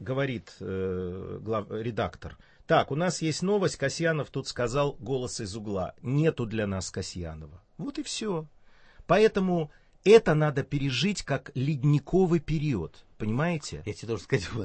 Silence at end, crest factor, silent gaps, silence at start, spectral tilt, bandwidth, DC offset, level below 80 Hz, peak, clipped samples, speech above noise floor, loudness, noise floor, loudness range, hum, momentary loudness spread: 0 s; 22 dB; none; 0 s; -6 dB/octave; 8.8 kHz; under 0.1%; -50 dBFS; -6 dBFS; under 0.1%; 25 dB; -28 LUFS; -53 dBFS; 7 LU; none; 13 LU